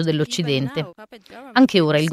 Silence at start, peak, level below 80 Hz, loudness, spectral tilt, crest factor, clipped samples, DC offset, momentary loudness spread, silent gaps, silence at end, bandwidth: 0 s; -2 dBFS; -60 dBFS; -19 LUFS; -5.5 dB/octave; 18 dB; under 0.1%; under 0.1%; 13 LU; none; 0 s; 14.5 kHz